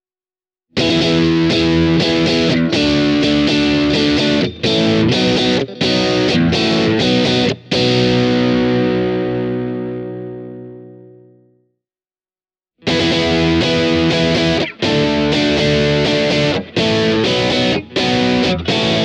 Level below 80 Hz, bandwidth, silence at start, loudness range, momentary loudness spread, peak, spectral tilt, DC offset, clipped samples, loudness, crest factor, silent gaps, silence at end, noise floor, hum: -38 dBFS; 10 kHz; 0.75 s; 8 LU; 6 LU; -2 dBFS; -5.5 dB/octave; under 0.1%; under 0.1%; -14 LUFS; 14 dB; none; 0 s; under -90 dBFS; none